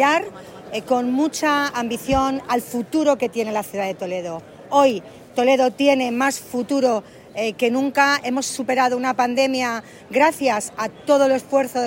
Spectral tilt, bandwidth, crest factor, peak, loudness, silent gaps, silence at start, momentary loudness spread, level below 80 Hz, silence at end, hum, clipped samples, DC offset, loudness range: -3.5 dB/octave; 16.5 kHz; 16 dB; -4 dBFS; -20 LUFS; none; 0 s; 10 LU; -50 dBFS; 0 s; none; under 0.1%; under 0.1%; 2 LU